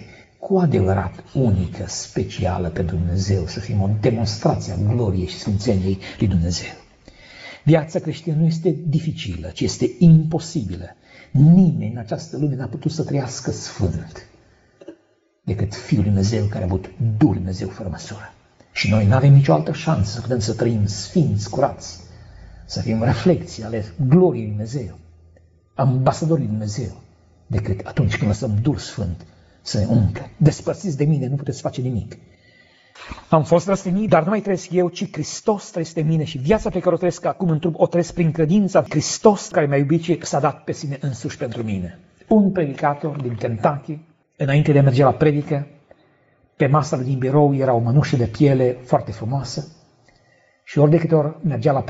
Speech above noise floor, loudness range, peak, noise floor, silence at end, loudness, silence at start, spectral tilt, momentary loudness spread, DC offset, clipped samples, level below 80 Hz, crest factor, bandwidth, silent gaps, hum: 42 dB; 5 LU; 0 dBFS; -61 dBFS; 0 s; -20 LUFS; 0 s; -7.5 dB/octave; 12 LU; under 0.1%; under 0.1%; -44 dBFS; 20 dB; 8 kHz; none; none